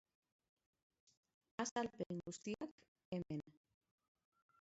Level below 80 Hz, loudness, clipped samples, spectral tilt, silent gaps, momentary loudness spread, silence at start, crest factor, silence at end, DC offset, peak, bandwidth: -80 dBFS; -47 LUFS; under 0.1%; -5 dB/octave; 1.71-1.76 s, 2.06-2.10 s, 2.71-2.78 s, 2.88-2.95 s, 3.05-3.12 s; 10 LU; 1.6 s; 22 dB; 1.15 s; under 0.1%; -30 dBFS; 7.6 kHz